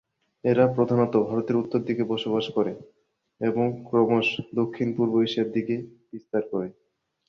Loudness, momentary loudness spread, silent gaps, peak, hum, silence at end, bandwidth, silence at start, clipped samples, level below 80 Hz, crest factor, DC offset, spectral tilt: -25 LUFS; 10 LU; none; -6 dBFS; none; 0.55 s; 6.8 kHz; 0.45 s; under 0.1%; -64 dBFS; 18 dB; under 0.1%; -8 dB/octave